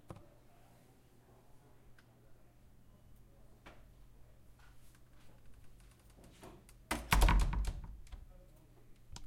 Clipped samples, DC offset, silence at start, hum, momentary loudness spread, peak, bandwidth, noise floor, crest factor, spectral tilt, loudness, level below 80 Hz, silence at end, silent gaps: under 0.1%; under 0.1%; 0.1 s; none; 31 LU; -14 dBFS; 16.5 kHz; -64 dBFS; 28 dB; -4.5 dB/octave; -35 LUFS; -42 dBFS; 0 s; none